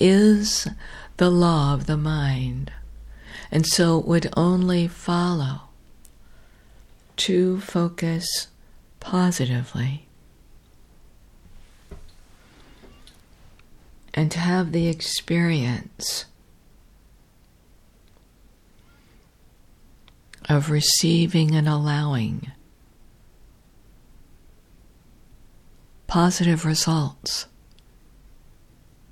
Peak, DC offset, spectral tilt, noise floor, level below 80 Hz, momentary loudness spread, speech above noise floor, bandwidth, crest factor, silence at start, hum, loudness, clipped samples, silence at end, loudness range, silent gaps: -4 dBFS; under 0.1%; -5 dB/octave; -55 dBFS; -46 dBFS; 18 LU; 34 dB; 15 kHz; 20 dB; 0 s; none; -22 LUFS; under 0.1%; 1.65 s; 10 LU; none